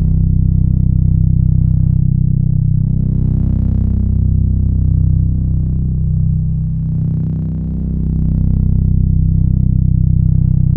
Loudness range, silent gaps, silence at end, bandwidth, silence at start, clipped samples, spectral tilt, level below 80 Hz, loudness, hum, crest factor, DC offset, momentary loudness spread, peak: 3 LU; none; 0 s; 1.2 kHz; 0 s; under 0.1%; -14.5 dB/octave; -16 dBFS; -15 LUFS; none; 12 dB; under 0.1%; 4 LU; 0 dBFS